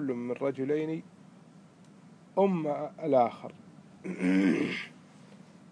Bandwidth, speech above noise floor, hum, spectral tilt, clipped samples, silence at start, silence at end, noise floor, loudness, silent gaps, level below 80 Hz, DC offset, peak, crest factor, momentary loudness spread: 10.5 kHz; 26 dB; none; -7.5 dB/octave; under 0.1%; 0 s; 0.35 s; -55 dBFS; -30 LUFS; none; -84 dBFS; under 0.1%; -14 dBFS; 18 dB; 16 LU